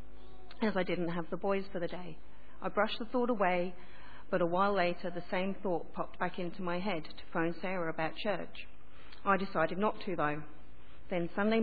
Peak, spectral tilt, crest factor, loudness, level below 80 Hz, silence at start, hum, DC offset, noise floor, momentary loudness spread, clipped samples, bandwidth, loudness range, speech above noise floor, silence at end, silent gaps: -14 dBFS; -4.5 dB/octave; 20 dB; -35 LUFS; -60 dBFS; 0 s; none; 1%; -57 dBFS; 14 LU; under 0.1%; 4.9 kHz; 3 LU; 23 dB; 0 s; none